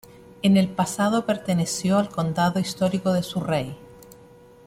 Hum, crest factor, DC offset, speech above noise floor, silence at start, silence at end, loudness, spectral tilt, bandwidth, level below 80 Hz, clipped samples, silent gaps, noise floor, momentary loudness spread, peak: none; 16 dB; under 0.1%; 27 dB; 0.45 s; 0.75 s; -23 LUFS; -5.5 dB/octave; 15.5 kHz; -56 dBFS; under 0.1%; none; -49 dBFS; 6 LU; -8 dBFS